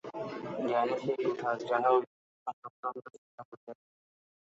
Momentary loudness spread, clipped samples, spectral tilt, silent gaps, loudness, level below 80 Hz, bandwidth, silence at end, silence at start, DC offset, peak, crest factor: 23 LU; under 0.1%; -6.5 dB/octave; 2.07-2.46 s, 2.53-2.62 s, 2.70-2.83 s, 3.18-3.38 s, 3.45-3.67 s; -32 LUFS; -80 dBFS; 7.8 kHz; 0.65 s; 0.05 s; under 0.1%; -14 dBFS; 20 dB